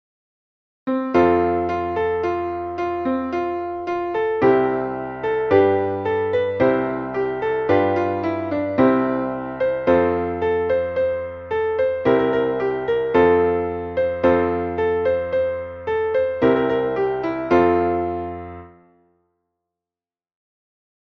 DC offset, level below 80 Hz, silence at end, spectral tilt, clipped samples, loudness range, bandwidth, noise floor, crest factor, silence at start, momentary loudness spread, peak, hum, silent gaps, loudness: under 0.1%; -50 dBFS; 2.35 s; -8.5 dB/octave; under 0.1%; 3 LU; 6.2 kHz; under -90 dBFS; 18 dB; 0.85 s; 9 LU; -4 dBFS; none; none; -20 LUFS